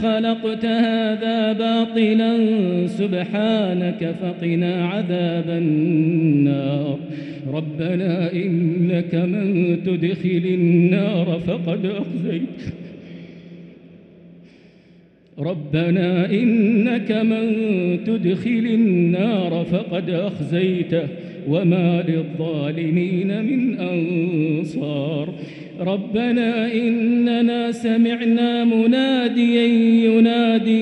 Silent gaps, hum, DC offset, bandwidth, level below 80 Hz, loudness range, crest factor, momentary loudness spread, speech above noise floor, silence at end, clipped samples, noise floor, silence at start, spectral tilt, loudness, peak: none; none; under 0.1%; 8.4 kHz; -60 dBFS; 5 LU; 14 dB; 8 LU; 32 dB; 0 s; under 0.1%; -50 dBFS; 0 s; -8.5 dB/octave; -19 LUFS; -6 dBFS